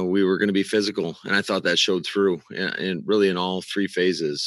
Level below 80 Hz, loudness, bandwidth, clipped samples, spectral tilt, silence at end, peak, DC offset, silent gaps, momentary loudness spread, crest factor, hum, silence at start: -72 dBFS; -22 LUFS; 12 kHz; under 0.1%; -4.5 dB/octave; 0 s; -6 dBFS; under 0.1%; none; 6 LU; 16 dB; none; 0 s